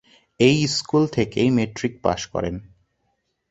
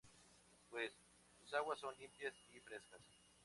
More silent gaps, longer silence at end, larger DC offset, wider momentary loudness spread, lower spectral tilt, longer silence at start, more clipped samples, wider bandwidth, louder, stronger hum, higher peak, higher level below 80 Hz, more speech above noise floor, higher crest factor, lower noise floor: neither; first, 0.9 s vs 0.25 s; neither; second, 10 LU vs 23 LU; first, -5.5 dB/octave vs -2.5 dB/octave; first, 0.4 s vs 0.05 s; neither; second, 8 kHz vs 11.5 kHz; first, -21 LUFS vs -49 LUFS; neither; first, -2 dBFS vs -28 dBFS; first, -48 dBFS vs -84 dBFS; first, 51 dB vs 21 dB; about the same, 20 dB vs 24 dB; about the same, -72 dBFS vs -70 dBFS